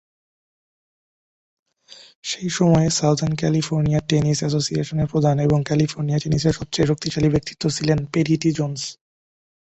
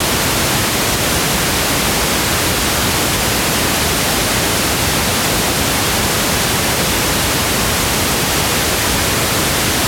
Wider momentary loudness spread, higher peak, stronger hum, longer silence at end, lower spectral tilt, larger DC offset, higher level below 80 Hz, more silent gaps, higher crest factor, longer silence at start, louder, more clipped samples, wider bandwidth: first, 7 LU vs 0 LU; about the same, -4 dBFS vs -4 dBFS; neither; first, 0.7 s vs 0 s; first, -5.5 dB/octave vs -2.5 dB/octave; neither; second, -46 dBFS vs -30 dBFS; first, 2.15-2.23 s vs none; first, 18 dB vs 12 dB; first, 1.9 s vs 0 s; second, -20 LUFS vs -14 LUFS; neither; second, 8.2 kHz vs over 20 kHz